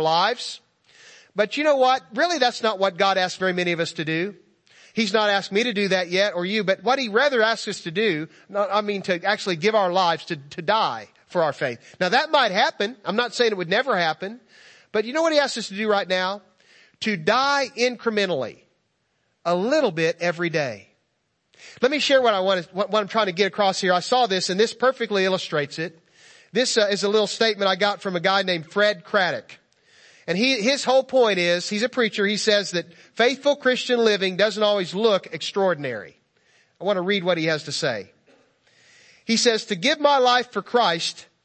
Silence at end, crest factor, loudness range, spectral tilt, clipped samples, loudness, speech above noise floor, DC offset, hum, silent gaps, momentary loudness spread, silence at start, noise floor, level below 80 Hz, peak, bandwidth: 0.2 s; 18 dB; 3 LU; -3.5 dB/octave; under 0.1%; -22 LUFS; 50 dB; under 0.1%; none; none; 9 LU; 0 s; -72 dBFS; -74 dBFS; -4 dBFS; 8.8 kHz